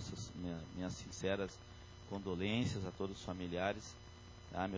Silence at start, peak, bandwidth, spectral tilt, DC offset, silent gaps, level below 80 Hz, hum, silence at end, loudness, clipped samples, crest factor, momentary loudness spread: 0 s; -22 dBFS; 7.6 kHz; -5.5 dB/octave; under 0.1%; none; -58 dBFS; none; 0 s; -42 LUFS; under 0.1%; 22 dB; 17 LU